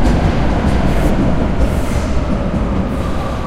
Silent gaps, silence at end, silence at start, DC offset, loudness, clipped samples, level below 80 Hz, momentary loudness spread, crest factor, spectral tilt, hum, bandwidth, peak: none; 0 s; 0 s; under 0.1%; -17 LUFS; under 0.1%; -18 dBFS; 3 LU; 12 dB; -7 dB/octave; none; 14 kHz; -2 dBFS